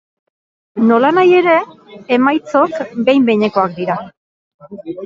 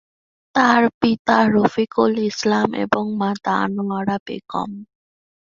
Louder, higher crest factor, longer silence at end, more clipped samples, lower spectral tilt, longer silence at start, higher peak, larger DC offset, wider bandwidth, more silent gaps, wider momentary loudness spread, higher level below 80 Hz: first, -13 LUFS vs -19 LUFS; about the same, 14 dB vs 18 dB; second, 0 s vs 0.65 s; neither; first, -7 dB/octave vs -5.5 dB/octave; first, 0.75 s vs 0.55 s; about the same, 0 dBFS vs -2 dBFS; neither; about the same, 7.4 kHz vs 7.4 kHz; first, 4.17-4.59 s vs 0.94-1.01 s, 1.19-1.25 s, 4.20-4.26 s; first, 15 LU vs 12 LU; about the same, -60 dBFS vs -58 dBFS